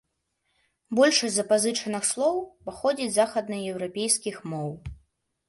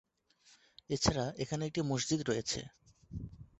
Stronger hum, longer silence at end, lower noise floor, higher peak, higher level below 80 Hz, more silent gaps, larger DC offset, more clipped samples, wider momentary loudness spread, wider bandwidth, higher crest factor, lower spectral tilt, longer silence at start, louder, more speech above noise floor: neither; first, 0.55 s vs 0.15 s; first, -76 dBFS vs -67 dBFS; first, -6 dBFS vs -14 dBFS; about the same, -56 dBFS vs -54 dBFS; neither; neither; neither; about the same, 13 LU vs 15 LU; first, 12 kHz vs 8.2 kHz; about the same, 20 dB vs 24 dB; second, -3 dB/octave vs -4.5 dB/octave; about the same, 0.9 s vs 0.9 s; first, -25 LUFS vs -35 LUFS; first, 51 dB vs 33 dB